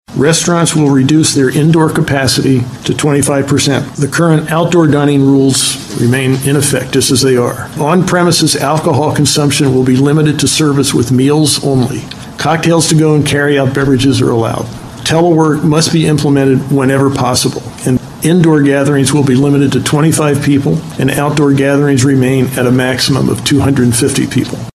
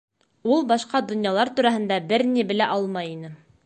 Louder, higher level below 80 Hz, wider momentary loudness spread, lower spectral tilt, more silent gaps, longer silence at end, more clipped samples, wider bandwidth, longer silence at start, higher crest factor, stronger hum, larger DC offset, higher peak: first, -10 LUFS vs -22 LUFS; first, -40 dBFS vs -70 dBFS; second, 5 LU vs 10 LU; about the same, -5 dB/octave vs -5 dB/octave; neither; second, 0.05 s vs 0.3 s; neither; first, 13.5 kHz vs 9 kHz; second, 0.1 s vs 0.45 s; second, 10 dB vs 16 dB; neither; neither; first, 0 dBFS vs -6 dBFS